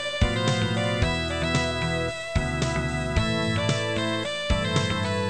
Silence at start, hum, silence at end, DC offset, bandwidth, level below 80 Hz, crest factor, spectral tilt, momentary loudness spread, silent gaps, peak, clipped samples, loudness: 0 s; none; 0 s; 0.5%; 11 kHz; -34 dBFS; 16 dB; -5 dB/octave; 3 LU; none; -10 dBFS; under 0.1%; -25 LUFS